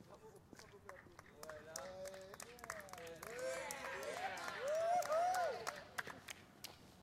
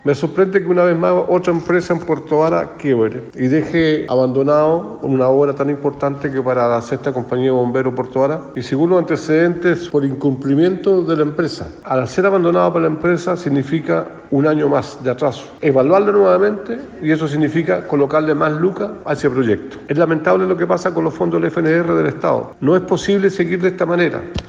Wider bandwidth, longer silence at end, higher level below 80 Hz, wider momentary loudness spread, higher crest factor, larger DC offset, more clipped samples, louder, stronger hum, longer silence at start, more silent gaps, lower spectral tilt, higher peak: first, 16.5 kHz vs 7.8 kHz; about the same, 0 s vs 0 s; second, -76 dBFS vs -48 dBFS; first, 21 LU vs 6 LU; first, 24 dB vs 14 dB; neither; neither; second, -44 LUFS vs -16 LUFS; neither; about the same, 0 s vs 0.05 s; neither; second, -2.5 dB/octave vs -7.5 dB/octave; second, -22 dBFS vs 0 dBFS